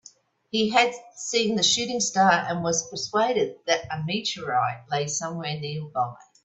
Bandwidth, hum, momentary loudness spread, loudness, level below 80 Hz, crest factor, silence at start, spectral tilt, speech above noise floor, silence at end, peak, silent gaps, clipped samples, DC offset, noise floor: 8.4 kHz; none; 10 LU; -24 LUFS; -66 dBFS; 22 dB; 0.55 s; -3 dB/octave; 29 dB; 0.25 s; -4 dBFS; none; under 0.1%; under 0.1%; -54 dBFS